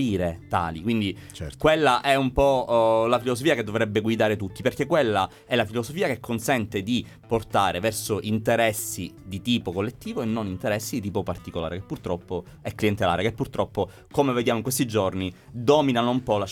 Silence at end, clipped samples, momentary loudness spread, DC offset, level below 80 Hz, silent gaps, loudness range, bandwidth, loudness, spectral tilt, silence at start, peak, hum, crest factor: 0 s; under 0.1%; 11 LU; under 0.1%; -48 dBFS; none; 6 LU; 18.5 kHz; -25 LUFS; -5 dB/octave; 0 s; -6 dBFS; none; 18 dB